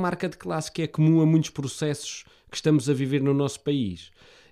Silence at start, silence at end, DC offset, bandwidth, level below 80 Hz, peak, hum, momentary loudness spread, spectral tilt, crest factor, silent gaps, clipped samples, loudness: 0 s; 0.45 s; under 0.1%; 13 kHz; -60 dBFS; -10 dBFS; none; 13 LU; -6.5 dB/octave; 16 dB; none; under 0.1%; -25 LUFS